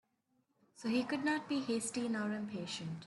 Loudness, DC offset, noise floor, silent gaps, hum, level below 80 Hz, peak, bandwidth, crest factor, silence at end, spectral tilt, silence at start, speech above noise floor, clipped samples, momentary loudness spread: -38 LUFS; under 0.1%; -79 dBFS; none; none; -80 dBFS; -22 dBFS; 12 kHz; 16 dB; 0 s; -4 dB/octave; 0.75 s; 42 dB; under 0.1%; 6 LU